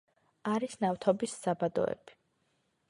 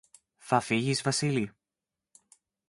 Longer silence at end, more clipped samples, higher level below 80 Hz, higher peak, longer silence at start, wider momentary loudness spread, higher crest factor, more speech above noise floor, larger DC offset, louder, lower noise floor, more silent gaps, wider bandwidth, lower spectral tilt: second, 0.8 s vs 1.2 s; neither; about the same, -72 dBFS vs -68 dBFS; second, -12 dBFS vs -8 dBFS; about the same, 0.45 s vs 0.45 s; about the same, 6 LU vs 5 LU; about the same, 22 dB vs 24 dB; second, 44 dB vs 62 dB; neither; second, -33 LUFS vs -29 LUFS; second, -76 dBFS vs -90 dBFS; neither; about the same, 11.5 kHz vs 11.5 kHz; about the same, -5.5 dB/octave vs -4.5 dB/octave